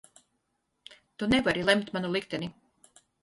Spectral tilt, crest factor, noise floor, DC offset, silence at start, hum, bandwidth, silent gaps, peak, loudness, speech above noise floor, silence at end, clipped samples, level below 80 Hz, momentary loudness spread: -5 dB/octave; 24 dB; -78 dBFS; under 0.1%; 1.2 s; none; 11.5 kHz; none; -8 dBFS; -28 LUFS; 50 dB; 0.7 s; under 0.1%; -56 dBFS; 14 LU